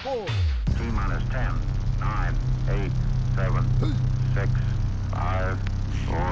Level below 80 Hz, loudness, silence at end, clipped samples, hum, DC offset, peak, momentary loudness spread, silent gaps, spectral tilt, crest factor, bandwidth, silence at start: -28 dBFS; -26 LUFS; 0 s; under 0.1%; none; 0.2%; -12 dBFS; 4 LU; none; -7.5 dB/octave; 12 dB; 7.2 kHz; 0 s